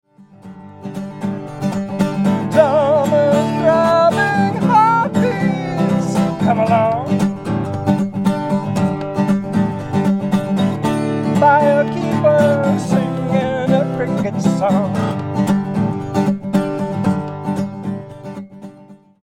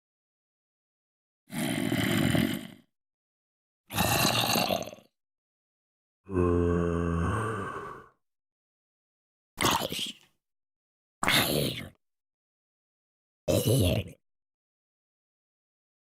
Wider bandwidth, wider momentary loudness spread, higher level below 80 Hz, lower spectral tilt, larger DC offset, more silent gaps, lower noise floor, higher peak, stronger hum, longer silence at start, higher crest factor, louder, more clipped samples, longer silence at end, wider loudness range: second, 13 kHz vs 16.5 kHz; second, 11 LU vs 16 LU; about the same, -50 dBFS vs -54 dBFS; first, -7.5 dB/octave vs -4.5 dB/octave; neither; second, none vs 3.14-3.84 s, 5.38-6.24 s, 8.52-9.57 s, 10.76-11.21 s, 12.34-13.47 s; second, -43 dBFS vs -47 dBFS; first, 0 dBFS vs -10 dBFS; neither; second, 0.45 s vs 1.5 s; second, 16 dB vs 22 dB; first, -16 LUFS vs -28 LUFS; neither; second, 0.3 s vs 1.9 s; about the same, 4 LU vs 4 LU